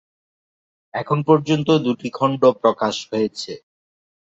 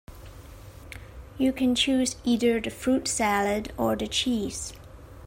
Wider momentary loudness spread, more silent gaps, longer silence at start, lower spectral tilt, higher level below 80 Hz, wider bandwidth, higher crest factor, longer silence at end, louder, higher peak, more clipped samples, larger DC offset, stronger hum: second, 14 LU vs 23 LU; neither; first, 0.95 s vs 0.1 s; first, -6.5 dB/octave vs -3.5 dB/octave; second, -62 dBFS vs -48 dBFS; second, 8 kHz vs 16 kHz; about the same, 18 dB vs 16 dB; first, 0.65 s vs 0 s; first, -19 LUFS vs -26 LUFS; first, -2 dBFS vs -10 dBFS; neither; neither; neither